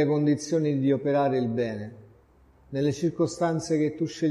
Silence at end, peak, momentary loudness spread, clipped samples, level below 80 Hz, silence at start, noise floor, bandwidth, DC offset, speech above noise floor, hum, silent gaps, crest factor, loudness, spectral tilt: 0 s; -12 dBFS; 7 LU; under 0.1%; -60 dBFS; 0 s; -58 dBFS; 11.5 kHz; under 0.1%; 33 dB; none; none; 14 dB; -26 LUFS; -7 dB/octave